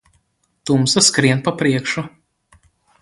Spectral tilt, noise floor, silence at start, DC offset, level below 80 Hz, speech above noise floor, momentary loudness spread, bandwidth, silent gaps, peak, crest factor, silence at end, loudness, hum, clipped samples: -3.5 dB/octave; -65 dBFS; 0.65 s; under 0.1%; -54 dBFS; 49 dB; 15 LU; 11.5 kHz; none; 0 dBFS; 18 dB; 0.95 s; -16 LUFS; none; under 0.1%